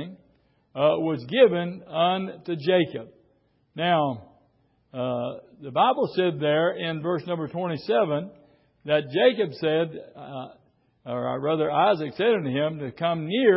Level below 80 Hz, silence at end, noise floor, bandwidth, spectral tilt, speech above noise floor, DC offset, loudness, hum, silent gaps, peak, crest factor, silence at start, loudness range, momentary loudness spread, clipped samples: -68 dBFS; 0 s; -65 dBFS; 5.8 kHz; -10.5 dB/octave; 41 dB; under 0.1%; -25 LUFS; none; none; -6 dBFS; 20 dB; 0 s; 3 LU; 17 LU; under 0.1%